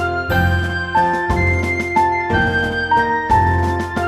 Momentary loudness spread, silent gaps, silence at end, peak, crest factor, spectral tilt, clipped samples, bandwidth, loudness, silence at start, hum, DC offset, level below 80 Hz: 3 LU; none; 0 s; -2 dBFS; 14 dB; -6.5 dB/octave; under 0.1%; 13 kHz; -17 LUFS; 0 s; none; under 0.1%; -30 dBFS